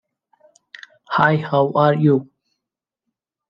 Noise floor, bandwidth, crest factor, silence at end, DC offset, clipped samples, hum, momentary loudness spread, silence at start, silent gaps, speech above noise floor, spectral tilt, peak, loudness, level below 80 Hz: -85 dBFS; 6.8 kHz; 20 dB; 1.25 s; under 0.1%; under 0.1%; none; 5 LU; 1.1 s; none; 69 dB; -8.5 dB/octave; -2 dBFS; -17 LUFS; -64 dBFS